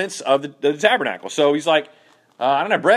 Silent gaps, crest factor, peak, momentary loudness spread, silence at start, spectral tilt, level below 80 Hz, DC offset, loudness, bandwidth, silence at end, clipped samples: none; 20 dB; 0 dBFS; 5 LU; 0 s; -3.5 dB/octave; -76 dBFS; under 0.1%; -19 LUFS; 13 kHz; 0 s; under 0.1%